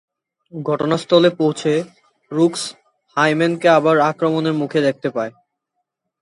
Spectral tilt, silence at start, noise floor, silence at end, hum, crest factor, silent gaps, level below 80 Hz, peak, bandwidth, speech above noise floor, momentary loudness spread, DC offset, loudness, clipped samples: -5.5 dB/octave; 0.55 s; -76 dBFS; 0.9 s; none; 18 dB; none; -66 dBFS; 0 dBFS; 11.5 kHz; 59 dB; 13 LU; under 0.1%; -18 LUFS; under 0.1%